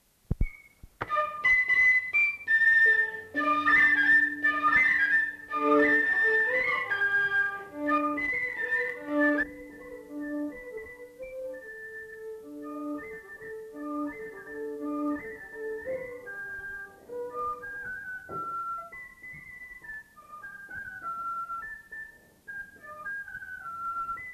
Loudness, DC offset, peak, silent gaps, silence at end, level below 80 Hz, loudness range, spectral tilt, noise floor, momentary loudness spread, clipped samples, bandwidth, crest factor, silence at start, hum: -26 LUFS; under 0.1%; -12 dBFS; none; 0 s; -48 dBFS; 17 LU; -5.5 dB/octave; -52 dBFS; 22 LU; under 0.1%; 14 kHz; 18 dB; 0.3 s; none